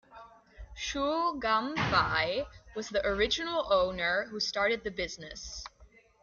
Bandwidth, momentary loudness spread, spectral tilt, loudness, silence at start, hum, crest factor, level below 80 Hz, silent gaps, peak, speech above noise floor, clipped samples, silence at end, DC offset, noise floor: 7.4 kHz; 14 LU; -3.5 dB/octave; -30 LUFS; 0.1 s; none; 20 dB; -52 dBFS; none; -12 dBFS; 29 dB; under 0.1%; 0.4 s; under 0.1%; -60 dBFS